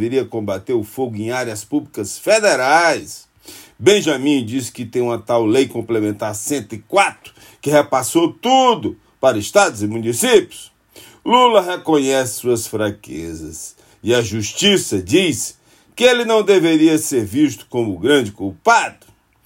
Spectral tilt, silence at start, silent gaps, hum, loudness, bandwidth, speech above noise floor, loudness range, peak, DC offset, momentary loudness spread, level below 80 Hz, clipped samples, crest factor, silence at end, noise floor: -4 dB/octave; 0 s; none; none; -16 LUFS; 16.5 kHz; 28 dB; 3 LU; 0 dBFS; under 0.1%; 13 LU; -58 dBFS; under 0.1%; 16 dB; 0.55 s; -45 dBFS